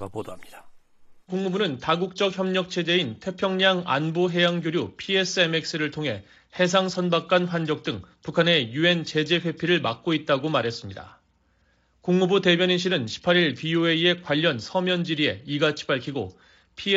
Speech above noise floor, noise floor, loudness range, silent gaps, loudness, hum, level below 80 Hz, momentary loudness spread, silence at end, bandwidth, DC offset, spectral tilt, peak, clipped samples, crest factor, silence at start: 41 dB; -65 dBFS; 3 LU; none; -23 LUFS; none; -64 dBFS; 12 LU; 0 s; 8 kHz; under 0.1%; -5 dB/octave; -6 dBFS; under 0.1%; 18 dB; 0 s